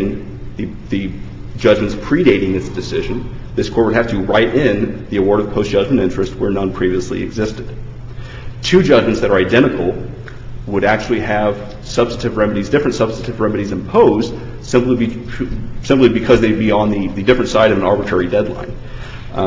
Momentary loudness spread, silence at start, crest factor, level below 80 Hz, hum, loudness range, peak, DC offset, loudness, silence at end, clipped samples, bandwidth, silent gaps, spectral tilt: 17 LU; 0 s; 16 dB; -32 dBFS; none; 3 LU; 0 dBFS; under 0.1%; -15 LUFS; 0 s; under 0.1%; 7.8 kHz; none; -6.5 dB/octave